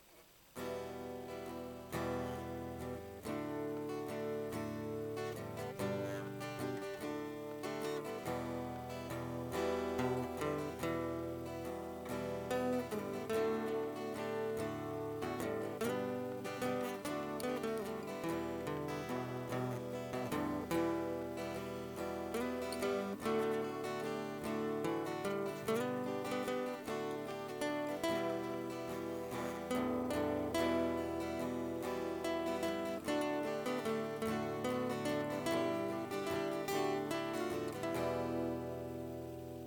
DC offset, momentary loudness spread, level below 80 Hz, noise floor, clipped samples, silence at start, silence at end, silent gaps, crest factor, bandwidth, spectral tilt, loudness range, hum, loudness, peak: under 0.1%; 7 LU; -66 dBFS; -63 dBFS; under 0.1%; 0 s; 0 s; none; 16 dB; 19 kHz; -5.5 dB/octave; 4 LU; none; -40 LUFS; -24 dBFS